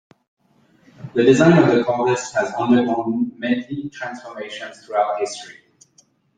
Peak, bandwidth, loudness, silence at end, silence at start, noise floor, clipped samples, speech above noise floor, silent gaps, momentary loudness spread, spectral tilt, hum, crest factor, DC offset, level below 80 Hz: -2 dBFS; 9.4 kHz; -18 LUFS; 0.85 s; 1 s; -58 dBFS; under 0.1%; 40 dB; none; 19 LU; -6 dB/octave; none; 18 dB; under 0.1%; -60 dBFS